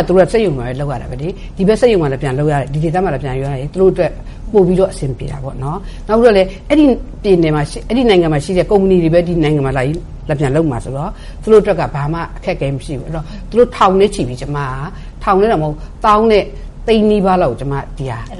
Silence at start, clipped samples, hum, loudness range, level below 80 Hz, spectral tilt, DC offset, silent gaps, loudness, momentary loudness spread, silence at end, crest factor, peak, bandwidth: 0 s; under 0.1%; none; 3 LU; -28 dBFS; -7 dB/octave; under 0.1%; none; -14 LUFS; 13 LU; 0 s; 14 dB; 0 dBFS; 11.5 kHz